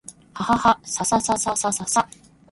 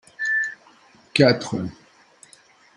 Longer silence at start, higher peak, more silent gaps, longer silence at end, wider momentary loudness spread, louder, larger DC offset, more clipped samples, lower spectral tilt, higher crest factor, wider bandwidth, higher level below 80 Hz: about the same, 0.1 s vs 0.2 s; about the same, -2 dBFS vs 0 dBFS; neither; second, 0.45 s vs 1.05 s; about the same, 11 LU vs 12 LU; about the same, -21 LUFS vs -21 LUFS; neither; neither; second, -3 dB/octave vs -5 dB/octave; about the same, 20 dB vs 24 dB; about the same, 12 kHz vs 11.5 kHz; first, -52 dBFS vs -62 dBFS